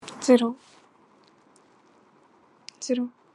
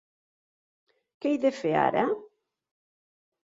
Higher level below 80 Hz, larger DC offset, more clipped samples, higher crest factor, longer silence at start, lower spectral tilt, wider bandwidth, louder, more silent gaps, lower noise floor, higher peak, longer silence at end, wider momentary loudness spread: second, -86 dBFS vs -72 dBFS; neither; neither; about the same, 22 dB vs 22 dB; second, 0.05 s vs 1.2 s; second, -4 dB/octave vs -6.5 dB/octave; first, 11.5 kHz vs 7.8 kHz; first, -24 LUFS vs -27 LUFS; neither; second, -59 dBFS vs under -90 dBFS; first, -6 dBFS vs -10 dBFS; second, 0.25 s vs 1.25 s; first, 26 LU vs 8 LU